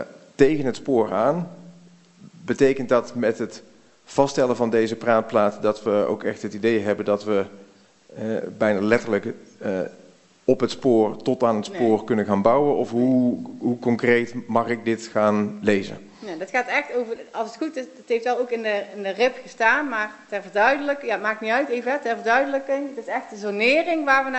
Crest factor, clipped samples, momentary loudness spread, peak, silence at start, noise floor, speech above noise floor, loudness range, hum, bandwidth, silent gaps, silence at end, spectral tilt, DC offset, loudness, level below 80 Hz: 20 dB; under 0.1%; 10 LU; -2 dBFS; 0 s; -52 dBFS; 30 dB; 4 LU; none; 8.4 kHz; none; 0 s; -5.5 dB/octave; under 0.1%; -22 LUFS; -60 dBFS